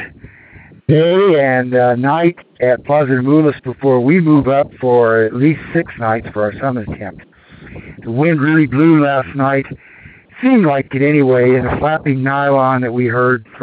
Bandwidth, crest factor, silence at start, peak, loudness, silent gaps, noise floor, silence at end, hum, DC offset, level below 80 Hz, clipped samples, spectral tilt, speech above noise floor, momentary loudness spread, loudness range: 4.7 kHz; 14 dB; 0 s; 0 dBFS; -13 LUFS; none; -41 dBFS; 0 s; none; under 0.1%; -44 dBFS; under 0.1%; -11.5 dB/octave; 28 dB; 9 LU; 4 LU